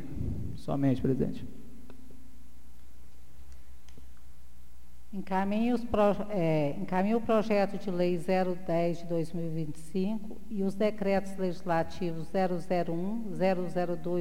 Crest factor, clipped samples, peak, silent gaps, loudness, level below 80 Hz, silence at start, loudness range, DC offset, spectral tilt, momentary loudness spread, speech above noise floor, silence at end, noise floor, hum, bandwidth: 16 dB; under 0.1%; -14 dBFS; none; -31 LUFS; -52 dBFS; 0 s; 8 LU; 2%; -8 dB/octave; 10 LU; 25 dB; 0 s; -55 dBFS; none; 16 kHz